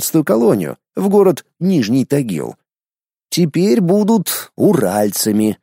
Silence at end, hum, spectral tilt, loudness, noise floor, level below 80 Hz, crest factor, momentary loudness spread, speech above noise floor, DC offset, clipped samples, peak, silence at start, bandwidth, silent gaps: 0.1 s; none; -5.5 dB/octave; -15 LUFS; under -90 dBFS; -60 dBFS; 14 dB; 8 LU; over 76 dB; under 0.1%; under 0.1%; 0 dBFS; 0 s; 16.5 kHz; none